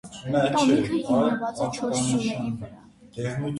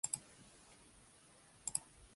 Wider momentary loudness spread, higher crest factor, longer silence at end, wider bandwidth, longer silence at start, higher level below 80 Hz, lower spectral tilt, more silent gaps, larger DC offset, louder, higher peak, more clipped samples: second, 12 LU vs 21 LU; second, 16 dB vs 32 dB; about the same, 0 s vs 0 s; about the same, 11.5 kHz vs 11.5 kHz; about the same, 0.05 s vs 0.05 s; first, -56 dBFS vs -72 dBFS; first, -5.5 dB/octave vs -0.5 dB/octave; neither; neither; first, -25 LUFS vs -43 LUFS; first, -10 dBFS vs -18 dBFS; neither